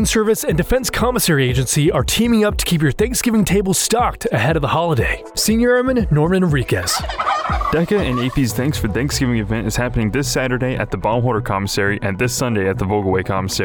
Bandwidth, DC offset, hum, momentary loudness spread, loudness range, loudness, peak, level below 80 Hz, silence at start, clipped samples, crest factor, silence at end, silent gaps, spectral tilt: over 20 kHz; under 0.1%; none; 4 LU; 3 LU; -17 LUFS; -6 dBFS; -30 dBFS; 0 s; under 0.1%; 10 dB; 0 s; none; -4.5 dB/octave